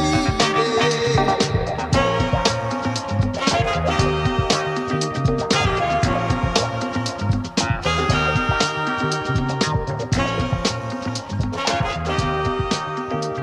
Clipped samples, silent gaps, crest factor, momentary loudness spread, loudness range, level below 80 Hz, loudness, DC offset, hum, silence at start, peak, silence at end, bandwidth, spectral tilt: under 0.1%; none; 16 dB; 6 LU; 3 LU; -34 dBFS; -21 LUFS; under 0.1%; none; 0 s; -4 dBFS; 0 s; 12.5 kHz; -5 dB/octave